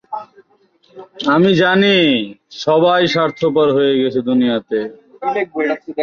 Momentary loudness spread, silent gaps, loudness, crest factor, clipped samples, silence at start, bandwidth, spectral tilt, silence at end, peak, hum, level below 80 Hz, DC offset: 11 LU; none; -15 LUFS; 14 dB; under 0.1%; 0.1 s; 7.2 kHz; -6 dB/octave; 0 s; -2 dBFS; none; -58 dBFS; under 0.1%